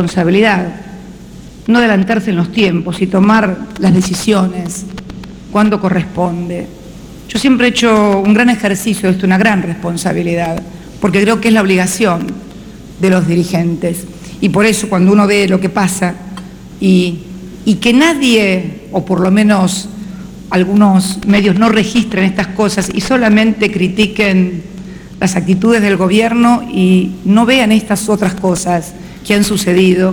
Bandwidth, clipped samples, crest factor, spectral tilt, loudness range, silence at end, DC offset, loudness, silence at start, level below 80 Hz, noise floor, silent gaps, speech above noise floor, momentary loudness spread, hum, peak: 19.5 kHz; under 0.1%; 12 dB; -5.5 dB/octave; 3 LU; 0 s; under 0.1%; -12 LUFS; 0 s; -38 dBFS; -32 dBFS; none; 21 dB; 18 LU; none; 0 dBFS